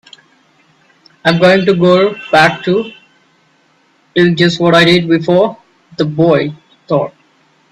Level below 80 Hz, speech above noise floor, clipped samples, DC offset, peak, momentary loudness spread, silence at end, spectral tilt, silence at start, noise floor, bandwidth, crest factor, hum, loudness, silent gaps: -52 dBFS; 43 dB; under 0.1%; under 0.1%; 0 dBFS; 10 LU; 0.65 s; -6 dB/octave; 1.25 s; -53 dBFS; 11.5 kHz; 12 dB; none; -11 LUFS; none